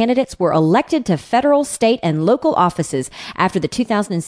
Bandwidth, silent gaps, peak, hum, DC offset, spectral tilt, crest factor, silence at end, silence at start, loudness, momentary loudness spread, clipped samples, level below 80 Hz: 11 kHz; none; -2 dBFS; none; under 0.1%; -5.5 dB/octave; 14 dB; 0 s; 0 s; -17 LUFS; 6 LU; under 0.1%; -50 dBFS